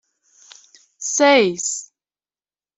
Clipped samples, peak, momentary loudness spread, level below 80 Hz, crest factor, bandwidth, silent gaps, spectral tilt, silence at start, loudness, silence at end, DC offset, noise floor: under 0.1%; -2 dBFS; 15 LU; -70 dBFS; 20 dB; 8.4 kHz; none; -2 dB/octave; 1 s; -17 LUFS; 0.95 s; under 0.1%; under -90 dBFS